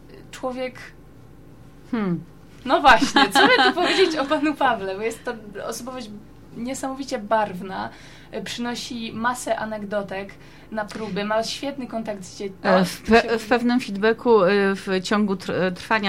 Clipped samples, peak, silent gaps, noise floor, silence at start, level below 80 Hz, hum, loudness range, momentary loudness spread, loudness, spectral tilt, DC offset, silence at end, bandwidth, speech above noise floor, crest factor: under 0.1%; -2 dBFS; none; -46 dBFS; 0.05 s; -50 dBFS; 50 Hz at -55 dBFS; 10 LU; 17 LU; -22 LUFS; -4.5 dB/octave; 0.3%; 0 s; 16 kHz; 24 dB; 22 dB